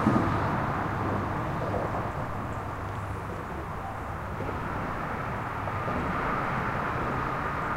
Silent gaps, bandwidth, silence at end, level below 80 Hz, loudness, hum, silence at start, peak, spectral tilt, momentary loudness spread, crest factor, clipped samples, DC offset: none; 16 kHz; 0 s; -44 dBFS; -31 LUFS; none; 0 s; -10 dBFS; -7.5 dB/octave; 7 LU; 20 dB; under 0.1%; under 0.1%